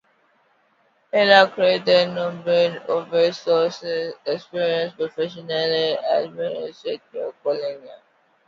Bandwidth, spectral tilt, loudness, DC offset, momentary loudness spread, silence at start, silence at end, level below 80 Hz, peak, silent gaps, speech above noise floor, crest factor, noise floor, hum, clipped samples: 7.6 kHz; -5 dB/octave; -21 LUFS; under 0.1%; 14 LU; 1.15 s; 0.5 s; -72 dBFS; 0 dBFS; none; 42 dB; 22 dB; -63 dBFS; none; under 0.1%